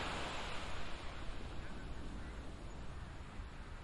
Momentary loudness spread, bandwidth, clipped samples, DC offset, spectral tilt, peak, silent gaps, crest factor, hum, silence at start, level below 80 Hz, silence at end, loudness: 8 LU; 11.5 kHz; under 0.1%; under 0.1%; -4.5 dB/octave; -30 dBFS; none; 14 dB; none; 0 s; -50 dBFS; 0 s; -48 LUFS